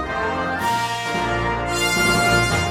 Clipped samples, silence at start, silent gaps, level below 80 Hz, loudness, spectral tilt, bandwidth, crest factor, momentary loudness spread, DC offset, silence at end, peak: under 0.1%; 0 s; none; -36 dBFS; -19 LUFS; -3.5 dB/octave; 16.5 kHz; 16 dB; 6 LU; under 0.1%; 0 s; -6 dBFS